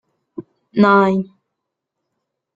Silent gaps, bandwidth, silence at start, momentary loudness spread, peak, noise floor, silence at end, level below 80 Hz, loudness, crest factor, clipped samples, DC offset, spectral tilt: none; 7.2 kHz; 0.4 s; 24 LU; -2 dBFS; -79 dBFS; 1.3 s; -62 dBFS; -15 LUFS; 18 dB; under 0.1%; under 0.1%; -8.5 dB/octave